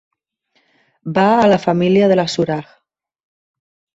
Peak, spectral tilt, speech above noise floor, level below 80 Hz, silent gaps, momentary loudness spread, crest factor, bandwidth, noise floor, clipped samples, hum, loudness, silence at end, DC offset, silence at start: -2 dBFS; -6.5 dB/octave; 51 dB; -56 dBFS; none; 10 LU; 16 dB; 8 kHz; -64 dBFS; under 0.1%; none; -15 LUFS; 1.35 s; under 0.1%; 1.05 s